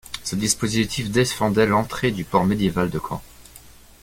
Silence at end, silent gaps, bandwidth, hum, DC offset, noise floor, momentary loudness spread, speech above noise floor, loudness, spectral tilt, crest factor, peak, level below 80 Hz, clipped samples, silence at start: 0.35 s; none; 17 kHz; none; under 0.1%; -46 dBFS; 8 LU; 25 dB; -21 LUFS; -4.5 dB/octave; 18 dB; -4 dBFS; -46 dBFS; under 0.1%; 0.05 s